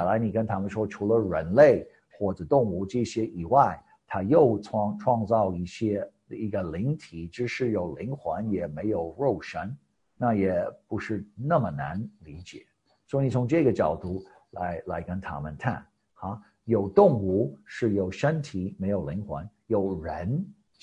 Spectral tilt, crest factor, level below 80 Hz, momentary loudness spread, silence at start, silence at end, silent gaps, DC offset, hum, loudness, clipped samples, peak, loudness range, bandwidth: -8 dB/octave; 22 dB; -50 dBFS; 16 LU; 0 s; 0.3 s; none; under 0.1%; none; -27 LUFS; under 0.1%; -6 dBFS; 6 LU; 9.8 kHz